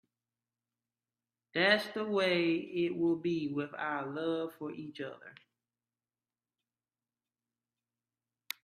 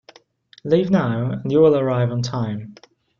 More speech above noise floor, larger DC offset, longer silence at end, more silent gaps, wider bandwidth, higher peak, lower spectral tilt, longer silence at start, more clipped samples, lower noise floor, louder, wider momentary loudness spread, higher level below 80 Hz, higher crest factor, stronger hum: first, over 57 dB vs 33 dB; neither; first, 3.3 s vs 0.45 s; neither; first, 14.5 kHz vs 7.2 kHz; second, -12 dBFS vs -4 dBFS; second, -5.5 dB/octave vs -8 dB/octave; first, 1.55 s vs 0.65 s; neither; first, under -90 dBFS vs -51 dBFS; second, -33 LUFS vs -19 LUFS; first, 15 LU vs 12 LU; second, -80 dBFS vs -56 dBFS; first, 24 dB vs 16 dB; neither